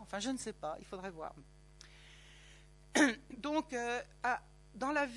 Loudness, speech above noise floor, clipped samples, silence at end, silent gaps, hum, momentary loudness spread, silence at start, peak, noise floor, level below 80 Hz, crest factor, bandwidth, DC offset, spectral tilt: -37 LUFS; 22 dB; under 0.1%; 0 s; none; none; 26 LU; 0 s; -14 dBFS; -59 dBFS; -62 dBFS; 24 dB; 12 kHz; under 0.1%; -3 dB/octave